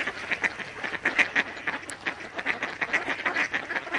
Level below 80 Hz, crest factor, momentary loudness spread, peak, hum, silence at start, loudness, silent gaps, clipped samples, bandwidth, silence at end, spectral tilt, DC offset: -64 dBFS; 24 dB; 9 LU; -6 dBFS; none; 0 s; -27 LUFS; none; under 0.1%; 11.5 kHz; 0 s; -2.5 dB/octave; under 0.1%